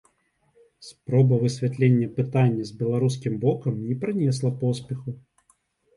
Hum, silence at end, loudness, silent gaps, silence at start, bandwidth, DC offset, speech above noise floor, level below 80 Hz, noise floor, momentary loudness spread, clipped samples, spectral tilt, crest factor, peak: none; 0.75 s; -24 LUFS; none; 0.8 s; 11.5 kHz; under 0.1%; 45 dB; -62 dBFS; -68 dBFS; 12 LU; under 0.1%; -8 dB/octave; 16 dB; -8 dBFS